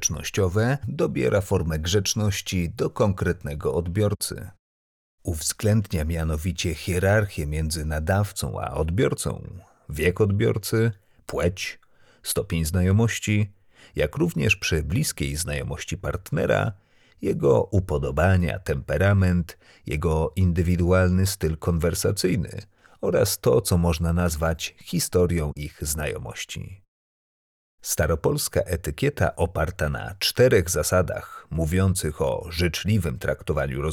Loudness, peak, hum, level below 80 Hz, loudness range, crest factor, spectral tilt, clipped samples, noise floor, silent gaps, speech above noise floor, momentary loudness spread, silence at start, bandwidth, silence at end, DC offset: -24 LUFS; -6 dBFS; none; -38 dBFS; 4 LU; 16 dB; -5 dB/octave; under 0.1%; under -90 dBFS; 4.59-5.18 s, 26.88-27.78 s; over 67 dB; 10 LU; 0 s; 18 kHz; 0 s; under 0.1%